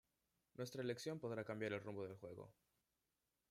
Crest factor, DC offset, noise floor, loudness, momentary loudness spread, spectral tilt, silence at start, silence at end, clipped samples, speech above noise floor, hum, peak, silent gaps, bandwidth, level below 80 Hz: 18 dB; under 0.1%; -90 dBFS; -49 LUFS; 13 LU; -5.5 dB/octave; 0.6 s; 1 s; under 0.1%; 42 dB; none; -32 dBFS; none; 16 kHz; -86 dBFS